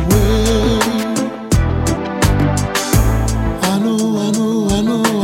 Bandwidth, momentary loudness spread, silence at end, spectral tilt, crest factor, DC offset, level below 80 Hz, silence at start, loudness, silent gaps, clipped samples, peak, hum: 16.5 kHz; 4 LU; 0 s; -5.5 dB/octave; 14 dB; under 0.1%; -22 dBFS; 0 s; -16 LUFS; none; under 0.1%; 0 dBFS; none